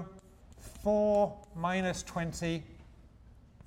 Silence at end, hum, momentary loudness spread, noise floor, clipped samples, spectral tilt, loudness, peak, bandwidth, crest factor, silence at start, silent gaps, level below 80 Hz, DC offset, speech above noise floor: 0.25 s; none; 23 LU; -57 dBFS; under 0.1%; -5.5 dB/octave; -32 LUFS; -18 dBFS; 16 kHz; 16 dB; 0 s; none; -54 dBFS; under 0.1%; 25 dB